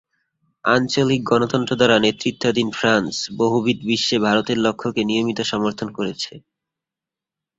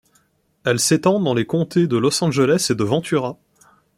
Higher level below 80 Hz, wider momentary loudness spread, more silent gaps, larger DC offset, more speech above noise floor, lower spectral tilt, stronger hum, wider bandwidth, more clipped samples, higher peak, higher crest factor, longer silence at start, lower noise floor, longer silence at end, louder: about the same, -56 dBFS vs -58 dBFS; about the same, 8 LU vs 6 LU; neither; neither; first, 68 dB vs 44 dB; about the same, -4.5 dB/octave vs -5 dB/octave; neither; second, 8 kHz vs 16.5 kHz; neither; about the same, -2 dBFS vs -4 dBFS; about the same, 18 dB vs 16 dB; about the same, 0.65 s vs 0.65 s; first, -88 dBFS vs -62 dBFS; first, 1.2 s vs 0.65 s; about the same, -19 LUFS vs -18 LUFS